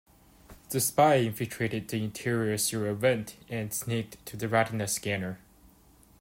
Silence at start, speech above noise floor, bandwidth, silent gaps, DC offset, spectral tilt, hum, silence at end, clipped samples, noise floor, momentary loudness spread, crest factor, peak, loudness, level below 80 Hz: 0.5 s; 30 dB; 16 kHz; none; under 0.1%; -4.5 dB/octave; none; 0.85 s; under 0.1%; -59 dBFS; 13 LU; 20 dB; -10 dBFS; -29 LUFS; -62 dBFS